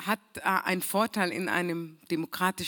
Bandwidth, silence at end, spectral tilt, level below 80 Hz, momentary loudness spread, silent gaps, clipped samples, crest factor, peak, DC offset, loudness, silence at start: 19 kHz; 0 s; -4 dB/octave; -70 dBFS; 7 LU; none; under 0.1%; 20 dB; -10 dBFS; under 0.1%; -29 LUFS; 0 s